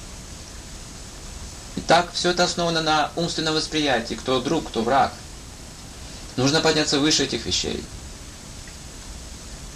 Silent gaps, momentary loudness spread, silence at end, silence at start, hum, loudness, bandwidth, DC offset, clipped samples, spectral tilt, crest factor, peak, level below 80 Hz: none; 19 LU; 0 s; 0 s; none; -21 LUFS; 15 kHz; under 0.1%; under 0.1%; -3.5 dB/octave; 18 dB; -6 dBFS; -42 dBFS